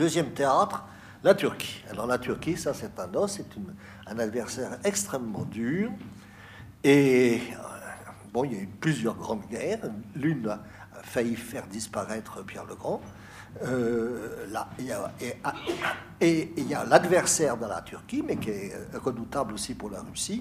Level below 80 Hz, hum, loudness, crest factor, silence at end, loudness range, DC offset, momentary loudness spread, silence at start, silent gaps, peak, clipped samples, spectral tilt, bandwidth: -58 dBFS; none; -29 LUFS; 26 dB; 0 s; 7 LU; under 0.1%; 17 LU; 0 s; none; -2 dBFS; under 0.1%; -4.5 dB/octave; 15.5 kHz